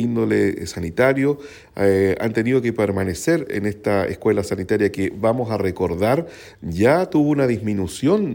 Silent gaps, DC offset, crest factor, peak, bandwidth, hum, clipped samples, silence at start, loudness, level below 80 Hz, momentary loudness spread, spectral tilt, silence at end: none; under 0.1%; 16 dB; -4 dBFS; 17 kHz; none; under 0.1%; 0 s; -20 LUFS; -48 dBFS; 7 LU; -6.5 dB/octave; 0 s